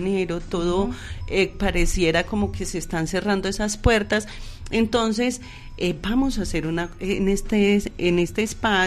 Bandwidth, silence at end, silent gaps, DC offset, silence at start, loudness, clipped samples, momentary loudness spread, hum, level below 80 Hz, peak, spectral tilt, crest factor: 13 kHz; 0 s; none; under 0.1%; 0 s; -23 LUFS; under 0.1%; 7 LU; none; -32 dBFS; -6 dBFS; -5 dB/octave; 16 dB